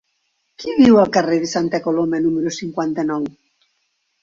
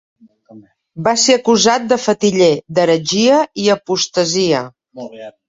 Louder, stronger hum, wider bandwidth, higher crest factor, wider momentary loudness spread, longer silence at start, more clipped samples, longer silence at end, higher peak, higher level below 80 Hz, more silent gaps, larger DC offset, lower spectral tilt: second, -17 LUFS vs -14 LUFS; neither; about the same, 7.6 kHz vs 8 kHz; about the same, 16 dB vs 14 dB; second, 12 LU vs 16 LU; about the same, 0.6 s vs 0.55 s; neither; first, 0.9 s vs 0.2 s; about the same, -2 dBFS vs 0 dBFS; about the same, -56 dBFS vs -56 dBFS; neither; neither; first, -5.5 dB/octave vs -3.5 dB/octave